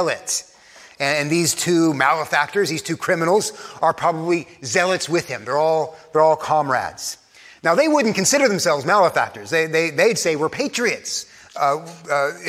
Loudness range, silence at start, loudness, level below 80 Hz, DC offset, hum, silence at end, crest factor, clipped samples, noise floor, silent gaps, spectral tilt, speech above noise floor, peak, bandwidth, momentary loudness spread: 3 LU; 0 s; -19 LUFS; -66 dBFS; under 0.1%; none; 0 s; 18 dB; under 0.1%; -46 dBFS; none; -3.5 dB/octave; 27 dB; -2 dBFS; 16 kHz; 8 LU